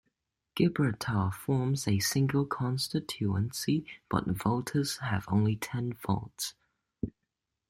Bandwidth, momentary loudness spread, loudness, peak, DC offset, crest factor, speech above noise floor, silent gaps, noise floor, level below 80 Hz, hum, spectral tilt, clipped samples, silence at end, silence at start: 16.5 kHz; 10 LU; -31 LUFS; -12 dBFS; under 0.1%; 18 dB; 55 dB; none; -85 dBFS; -58 dBFS; none; -5.5 dB/octave; under 0.1%; 0.6 s; 0.55 s